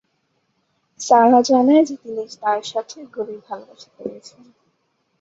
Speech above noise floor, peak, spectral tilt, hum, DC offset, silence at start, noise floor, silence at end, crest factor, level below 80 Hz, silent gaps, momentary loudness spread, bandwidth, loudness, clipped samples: 50 dB; -2 dBFS; -4 dB/octave; none; under 0.1%; 1 s; -69 dBFS; 1.05 s; 18 dB; -70 dBFS; none; 21 LU; 8 kHz; -17 LUFS; under 0.1%